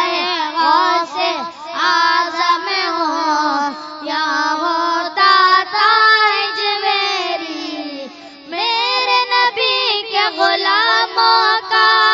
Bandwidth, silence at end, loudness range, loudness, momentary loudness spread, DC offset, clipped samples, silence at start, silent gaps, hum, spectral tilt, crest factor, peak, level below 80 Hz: 7.8 kHz; 0 s; 4 LU; -14 LUFS; 12 LU; under 0.1%; under 0.1%; 0 s; none; none; -0.5 dB/octave; 16 dB; 0 dBFS; -70 dBFS